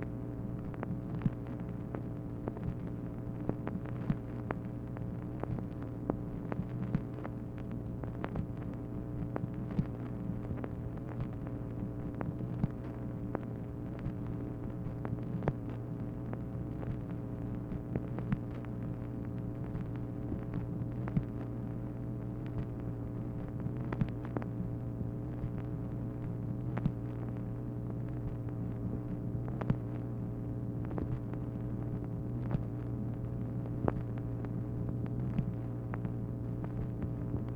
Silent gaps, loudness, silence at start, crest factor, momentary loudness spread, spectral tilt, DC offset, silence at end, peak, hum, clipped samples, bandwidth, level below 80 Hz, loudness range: none; -39 LUFS; 0 s; 26 dB; 5 LU; -10.5 dB/octave; under 0.1%; 0 s; -12 dBFS; none; under 0.1%; 3.8 kHz; -48 dBFS; 2 LU